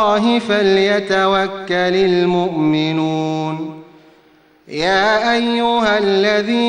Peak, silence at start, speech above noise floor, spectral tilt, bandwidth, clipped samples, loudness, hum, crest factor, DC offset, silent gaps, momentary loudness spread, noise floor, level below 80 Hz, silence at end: -2 dBFS; 0 s; 36 dB; -5.5 dB/octave; 10 kHz; under 0.1%; -15 LUFS; none; 14 dB; under 0.1%; none; 7 LU; -51 dBFS; -52 dBFS; 0 s